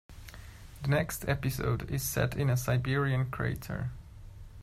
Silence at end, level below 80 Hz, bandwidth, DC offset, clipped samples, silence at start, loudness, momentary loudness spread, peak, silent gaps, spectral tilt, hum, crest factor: 0 s; -48 dBFS; 16 kHz; under 0.1%; under 0.1%; 0.1 s; -31 LUFS; 20 LU; -14 dBFS; none; -5.5 dB/octave; none; 18 dB